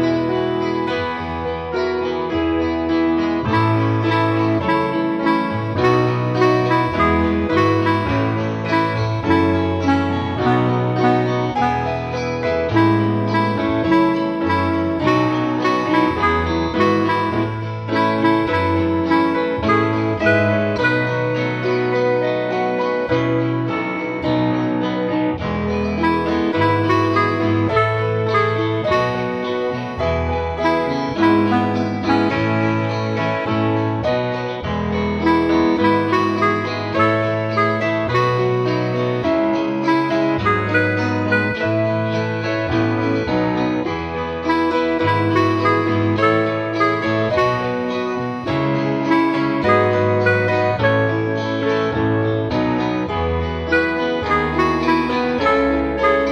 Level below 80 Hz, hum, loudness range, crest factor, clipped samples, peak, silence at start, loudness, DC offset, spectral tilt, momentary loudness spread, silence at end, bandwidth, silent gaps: -40 dBFS; none; 2 LU; 16 dB; under 0.1%; -2 dBFS; 0 s; -18 LUFS; under 0.1%; -7.5 dB/octave; 5 LU; 0 s; 7 kHz; none